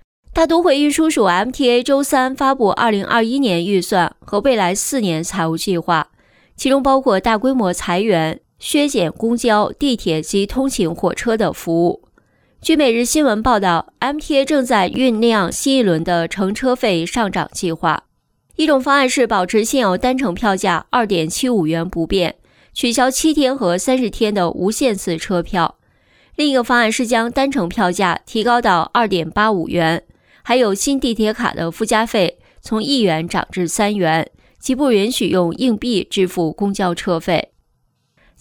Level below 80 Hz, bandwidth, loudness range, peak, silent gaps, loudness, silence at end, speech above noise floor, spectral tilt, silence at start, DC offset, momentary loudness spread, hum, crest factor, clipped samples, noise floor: -42 dBFS; 19.5 kHz; 2 LU; -2 dBFS; none; -17 LUFS; 0.95 s; 48 dB; -4.5 dB/octave; 0.3 s; under 0.1%; 6 LU; none; 14 dB; under 0.1%; -64 dBFS